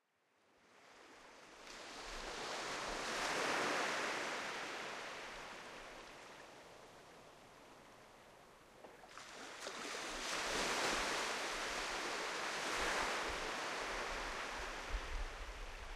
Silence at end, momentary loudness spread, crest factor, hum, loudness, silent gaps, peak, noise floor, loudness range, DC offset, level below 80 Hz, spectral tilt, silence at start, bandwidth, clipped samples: 0 s; 22 LU; 20 dB; none; -41 LUFS; none; -24 dBFS; -77 dBFS; 16 LU; under 0.1%; -56 dBFS; -1.5 dB/octave; 0.7 s; 15 kHz; under 0.1%